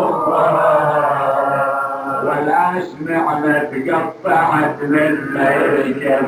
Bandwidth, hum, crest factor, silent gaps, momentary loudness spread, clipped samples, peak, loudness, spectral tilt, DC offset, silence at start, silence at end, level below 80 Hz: 14 kHz; none; 12 dB; none; 5 LU; under 0.1%; -4 dBFS; -16 LUFS; -7 dB/octave; under 0.1%; 0 s; 0 s; -58 dBFS